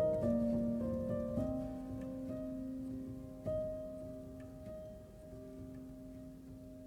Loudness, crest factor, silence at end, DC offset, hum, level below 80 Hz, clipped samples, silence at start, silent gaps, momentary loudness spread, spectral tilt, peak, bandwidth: -41 LUFS; 16 dB; 0 s; under 0.1%; none; -56 dBFS; under 0.1%; 0 s; none; 17 LU; -9.5 dB/octave; -24 dBFS; 16 kHz